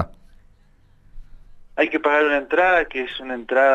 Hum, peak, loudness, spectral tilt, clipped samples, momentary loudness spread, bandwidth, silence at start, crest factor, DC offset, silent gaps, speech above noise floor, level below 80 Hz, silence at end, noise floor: none; -6 dBFS; -20 LUFS; -5.5 dB/octave; under 0.1%; 13 LU; 8 kHz; 0 s; 16 dB; under 0.1%; none; 35 dB; -46 dBFS; 0 s; -54 dBFS